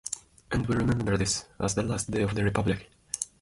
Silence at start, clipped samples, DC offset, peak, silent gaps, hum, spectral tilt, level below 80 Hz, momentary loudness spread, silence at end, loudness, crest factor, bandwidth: 0.05 s; under 0.1%; under 0.1%; -8 dBFS; none; none; -5 dB/octave; -46 dBFS; 8 LU; 0.15 s; -29 LUFS; 20 dB; 11.5 kHz